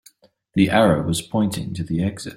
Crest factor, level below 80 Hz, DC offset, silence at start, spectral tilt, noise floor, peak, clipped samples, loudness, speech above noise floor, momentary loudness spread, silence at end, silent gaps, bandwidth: 18 dB; -50 dBFS; under 0.1%; 0.55 s; -6 dB/octave; -54 dBFS; -2 dBFS; under 0.1%; -20 LUFS; 34 dB; 10 LU; 0 s; none; 16 kHz